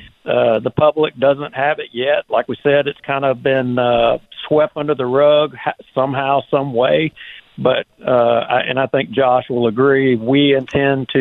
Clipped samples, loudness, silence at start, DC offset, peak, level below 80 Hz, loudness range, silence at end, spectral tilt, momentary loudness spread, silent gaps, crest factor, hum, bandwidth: under 0.1%; -16 LUFS; 0 s; under 0.1%; -2 dBFS; -52 dBFS; 2 LU; 0 s; -8 dB/octave; 6 LU; none; 12 dB; none; 4.2 kHz